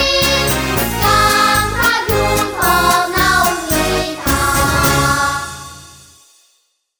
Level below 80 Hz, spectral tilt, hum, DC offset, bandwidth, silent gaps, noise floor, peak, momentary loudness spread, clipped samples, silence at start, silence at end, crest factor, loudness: -28 dBFS; -3 dB/octave; none; under 0.1%; over 20 kHz; none; -61 dBFS; 0 dBFS; 6 LU; under 0.1%; 0 s; 1.1 s; 14 dB; -13 LUFS